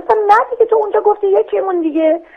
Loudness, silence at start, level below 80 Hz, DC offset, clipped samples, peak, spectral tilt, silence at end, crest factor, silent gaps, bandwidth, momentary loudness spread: -13 LUFS; 0 s; -58 dBFS; under 0.1%; under 0.1%; 0 dBFS; -5 dB/octave; 0.15 s; 14 dB; none; 6.4 kHz; 5 LU